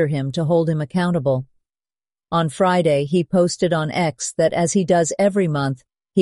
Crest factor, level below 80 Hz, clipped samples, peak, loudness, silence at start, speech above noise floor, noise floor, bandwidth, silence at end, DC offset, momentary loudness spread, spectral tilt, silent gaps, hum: 14 dB; -58 dBFS; under 0.1%; -6 dBFS; -19 LUFS; 0 s; over 71 dB; under -90 dBFS; 11.5 kHz; 0 s; under 0.1%; 6 LU; -6 dB/octave; none; none